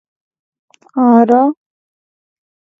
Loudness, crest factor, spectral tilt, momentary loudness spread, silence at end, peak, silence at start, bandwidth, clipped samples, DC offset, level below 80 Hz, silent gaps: -11 LUFS; 16 dB; -9 dB/octave; 16 LU; 1.25 s; 0 dBFS; 0.95 s; 3.6 kHz; under 0.1%; under 0.1%; -70 dBFS; none